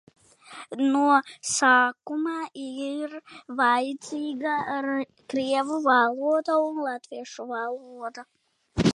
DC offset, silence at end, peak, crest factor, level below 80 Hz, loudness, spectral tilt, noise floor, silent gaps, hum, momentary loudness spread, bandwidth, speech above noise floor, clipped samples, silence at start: under 0.1%; 0 s; -6 dBFS; 20 dB; -56 dBFS; -25 LUFS; -4 dB/octave; -46 dBFS; none; none; 17 LU; 11.5 kHz; 21 dB; under 0.1%; 0.5 s